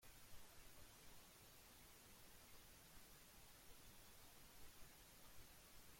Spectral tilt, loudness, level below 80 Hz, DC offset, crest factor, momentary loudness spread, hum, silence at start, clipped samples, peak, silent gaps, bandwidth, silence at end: -2.5 dB/octave; -65 LUFS; -72 dBFS; under 0.1%; 16 dB; 0 LU; none; 0 s; under 0.1%; -48 dBFS; none; 16.5 kHz; 0 s